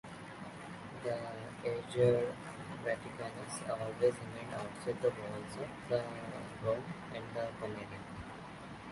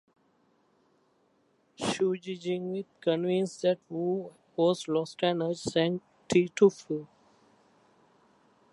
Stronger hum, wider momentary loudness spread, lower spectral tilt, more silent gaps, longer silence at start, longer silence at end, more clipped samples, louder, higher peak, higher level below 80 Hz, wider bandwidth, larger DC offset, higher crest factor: neither; first, 14 LU vs 11 LU; about the same, -6 dB/octave vs -5.5 dB/octave; neither; second, 0.05 s vs 1.8 s; second, 0 s vs 1.7 s; neither; second, -39 LUFS vs -29 LUFS; second, -16 dBFS vs -10 dBFS; about the same, -66 dBFS vs -70 dBFS; about the same, 11.5 kHz vs 11.5 kHz; neither; about the same, 22 dB vs 20 dB